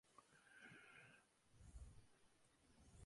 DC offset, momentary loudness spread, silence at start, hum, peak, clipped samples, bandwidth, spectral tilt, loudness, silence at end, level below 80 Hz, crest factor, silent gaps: under 0.1%; 5 LU; 0.05 s; none; -48 dBFS; under 0.1%; 11.5 kHz; -4 dB/octave; -65 LUFS; 0 s; -70 dBFS; 20 dB; none